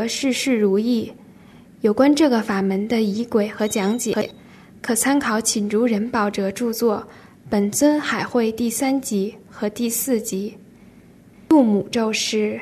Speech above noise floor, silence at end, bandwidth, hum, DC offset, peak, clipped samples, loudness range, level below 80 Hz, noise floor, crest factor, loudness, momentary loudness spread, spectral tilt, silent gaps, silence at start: 28 dB; 0 s; 13.5 kHz; none; under 0.1%; -4 dBFS; under 0.1%; 2 LU; -58 dBFS; -48 dBFS; 16 dB; -20 LUFS; 8 LU; -4 dB/octave; none; 0 s